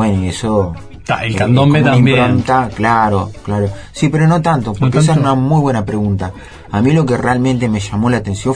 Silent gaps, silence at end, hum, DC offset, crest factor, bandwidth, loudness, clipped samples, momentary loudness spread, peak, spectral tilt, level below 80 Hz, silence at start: none; 0 s; none; under 0.1%; 12 dB; 10.5 kHz; -13 LUFS; under 0.1%; 10 LU; 0 dBFS; -7 dB/octave; -36 dBFS; 0 s